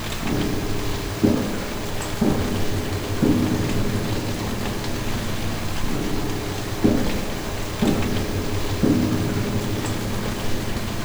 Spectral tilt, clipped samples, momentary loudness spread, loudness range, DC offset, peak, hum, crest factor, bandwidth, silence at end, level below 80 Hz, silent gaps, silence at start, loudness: -5.5 dB/octave; under 0.1%; 6 LU; 2 LU; under 0.1%; -4 dBFS; none; 18 dB; over 20 kHz; 0 s; -32 dBFS; none; 0 s; -24 LUFS